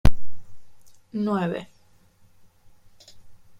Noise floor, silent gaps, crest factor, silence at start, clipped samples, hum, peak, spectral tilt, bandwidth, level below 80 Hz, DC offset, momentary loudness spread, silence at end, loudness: -57 dBFS; none; 20 dB; 0.05 s; under 0.1%; none; -2 dBFS; -7.5 dB/octave; 14 kHz; -34 dBFS; under 0.1%; 27 LU; 0.25 s; -28 LUFS